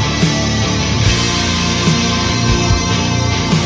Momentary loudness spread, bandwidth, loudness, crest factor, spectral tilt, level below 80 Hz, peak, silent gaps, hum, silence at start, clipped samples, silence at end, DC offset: 2 LU; 8 kHz; -14 LUFS; 12 dB; -4 dB/octave; -24 dBFS; -2 dBFS; none; none; 0 s; under 0.1%; 0 s; under 0.1%